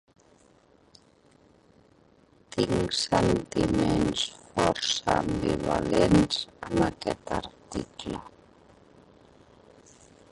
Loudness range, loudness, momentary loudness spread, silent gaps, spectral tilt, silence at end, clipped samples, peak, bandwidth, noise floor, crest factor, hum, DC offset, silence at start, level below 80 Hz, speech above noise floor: 8 LU; -27 LUFS; 14 LU; none; -5 dB/octave; 2.05 s; under 0.1%; -8 dBFS; 11.5 kHz; -60 dBFS; 20 dB; none; under 0.1%; 2.55 s; -46 dBFS; 34 dB